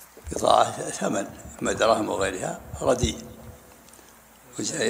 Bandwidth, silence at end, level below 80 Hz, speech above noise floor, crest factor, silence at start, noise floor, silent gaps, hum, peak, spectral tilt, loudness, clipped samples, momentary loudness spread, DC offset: 16 kHz; 0 s; -46 dBFS; 26 dB; 24 dB; 0 s; -51 dBFS; none; none; -2 dBFS; -3.5 dB/octave; -25 LUFS; under 0.1%; 18 LU; under 0.1%